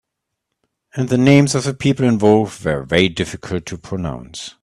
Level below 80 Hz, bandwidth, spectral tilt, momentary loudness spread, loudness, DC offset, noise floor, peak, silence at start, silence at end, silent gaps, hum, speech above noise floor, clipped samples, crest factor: -46 dBFS; 12.5 kHz; -6 dB/octave; 15 LU; -17 LUFS; under 0.1%; -79 dBFS; 0 dBFS; 0.95 s; 0.15 s; none; none; 62 dB; under 0.1%; 18 dB